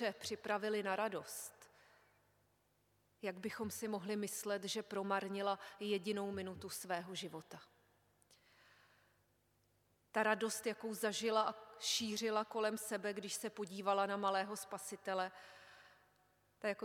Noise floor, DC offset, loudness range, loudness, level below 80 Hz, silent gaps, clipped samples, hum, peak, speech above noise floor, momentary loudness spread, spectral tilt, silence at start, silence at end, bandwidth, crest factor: -78 dBFS; under 0.1%; 8 LU; -41 LUFS; -86 dBFS; none; under 0.1%; 50 Hz at -70 dBFS; -20 dBFS; 37 dB; 10 LU; -3 dB/octave; 0 s; 0 s; 18 kHz; 22 dB